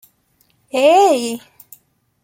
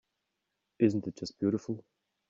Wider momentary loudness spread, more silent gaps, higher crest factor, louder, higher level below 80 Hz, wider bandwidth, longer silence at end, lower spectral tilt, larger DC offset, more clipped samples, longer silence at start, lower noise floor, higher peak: first, 15 LU vs 12 LU; neither; second, 16 dB vs 22 dB; first, -14 LUFS vs -32 LUFS; about the same, -68 dBFS vs -72 dBFS; first, 16.5 kHz vs 7.6 kHz; first, 0.85 s vs 0.5 s; second, -2.5 dB/octave vs -7.5 dB/octave; neither; neither; about the same, 0.75 s vs 0.8 s; second, -60 dBFS vs -84 dBFS; first, -2 dBFS vs -12 dBFS